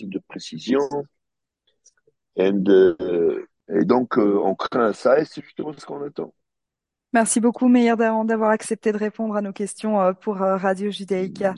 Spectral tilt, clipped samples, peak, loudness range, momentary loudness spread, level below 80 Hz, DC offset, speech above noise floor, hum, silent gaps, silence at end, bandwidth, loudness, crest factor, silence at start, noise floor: -5.5 dB/octave; under 0.1%; -4 dBFS; 3 LU; 15 LU; -66 dBFS; under 0.1%; 64 dB; none; none; 0 s; 11.5 kHz; -21 LUFS; 18 dB; 0 s; -85 dBFS